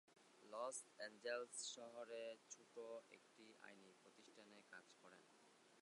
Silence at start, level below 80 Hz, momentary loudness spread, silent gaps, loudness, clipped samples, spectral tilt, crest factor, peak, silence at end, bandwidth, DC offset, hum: 0.1 s; under -90 dBFS; 18 LU; none; -54 LUFS; under 0.1%; -1 dB/octave; 22 dB; -34 dBFS; 0 s; 11 kHz; under 0.1%; none